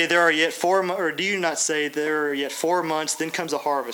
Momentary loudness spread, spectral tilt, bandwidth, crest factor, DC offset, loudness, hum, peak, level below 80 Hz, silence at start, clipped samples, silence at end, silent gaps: 7 LU; -2 dB/octave; over 20 kHz; 18 dB; under 0.1%; -23 LUFS; none; -6 dBFS; -78 dBFS; 0 s; under 0.1%; 0 s; none